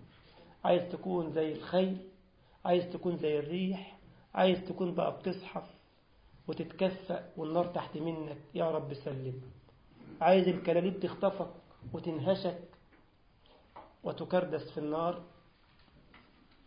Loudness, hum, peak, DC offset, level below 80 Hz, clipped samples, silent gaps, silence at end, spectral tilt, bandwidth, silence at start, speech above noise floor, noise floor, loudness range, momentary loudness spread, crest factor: -34 LUFS; none; -12 dBFS; under 0.1%; -68 dBFS; under 0.1%; none; 0.5 s; -5.5 dB/octave; 5.2 kHz; 0 s; 31 dB; -64 dBFS; 6 LU; 13 LU; 22 dB